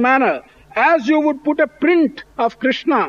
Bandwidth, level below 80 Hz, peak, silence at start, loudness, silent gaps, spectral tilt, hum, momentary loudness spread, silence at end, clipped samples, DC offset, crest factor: 7 kHz; -56 dBFS; -4 dBFS; 0 s; -17 LUFS; none; -5.5 dB/octave; none; 7 LU; 0 s; under 0.1%; under 0.1%; 14 dB